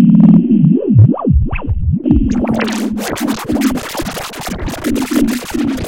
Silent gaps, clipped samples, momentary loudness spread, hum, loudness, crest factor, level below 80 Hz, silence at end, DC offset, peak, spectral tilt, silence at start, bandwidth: none; 0.4%; 12 LU; none; -14 LUFS; 12 dB; -24 dBFS; 0 s; under 0.1%; 0 dBFS; -7 dB/octave; 0 s; 17.5 kHz